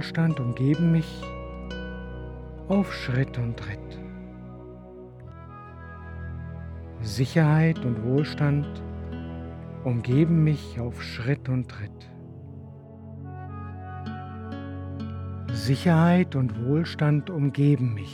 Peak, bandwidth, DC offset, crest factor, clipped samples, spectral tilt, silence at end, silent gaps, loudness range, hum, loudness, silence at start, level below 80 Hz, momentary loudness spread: -8 dBFS; 11.5 kHz; under 0.1%; 20 dB; under 0.1%; -8 dB/octave; 0 s; none; 13 LU; none; -26 LUFS; 0 s; -46 dBFS; 21 LU